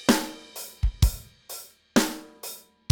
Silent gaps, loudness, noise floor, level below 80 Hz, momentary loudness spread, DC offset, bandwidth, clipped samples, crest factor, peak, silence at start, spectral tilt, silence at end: none; -28 LUFS; -43 dBFS; -32 dBFS; 15 LU; under 0.1%; 20 kHz; under 0.1%; 22 dB; -4 dBFS; 0 s; -4.5 dB/octave; 0.35 s